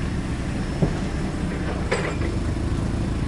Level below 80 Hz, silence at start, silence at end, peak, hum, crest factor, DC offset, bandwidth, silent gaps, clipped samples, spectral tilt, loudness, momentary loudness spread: -30 dBFS; 0 s; 0 s; -8 dBFS; none; 16 dB; under 0.1%; 11.5 kHz; none; under 0.1%; -6.5 dB/octave; -26 LUFS; 3 LU